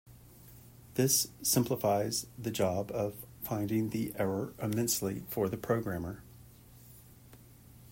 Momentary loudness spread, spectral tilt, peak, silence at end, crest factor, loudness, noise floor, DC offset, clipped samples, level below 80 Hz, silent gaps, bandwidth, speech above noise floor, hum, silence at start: 11 LU; -4.5 dB/octave; -14 dBFS; 0 s; 20 dB; -32 LUFS; -56 dBFS; under 0.1%; under 0.1%; -62 dBFS; none; 16.5 kHz; 23 dB; none; 0.05 s